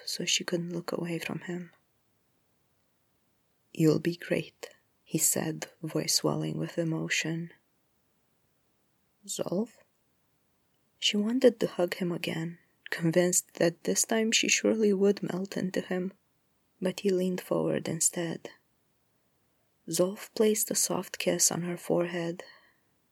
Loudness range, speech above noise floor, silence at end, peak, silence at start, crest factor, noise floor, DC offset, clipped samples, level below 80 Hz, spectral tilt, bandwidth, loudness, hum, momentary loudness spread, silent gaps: 8 LU; 43 dB; 0.6 s; -8 dBFS; 0 s; 22 dB; -72 dBFS; under 0.1%; under 0.1%; -76 dBFS; -3.5 dB/octave; over 20 kHz; -29 LUFS; none; 13 LU; none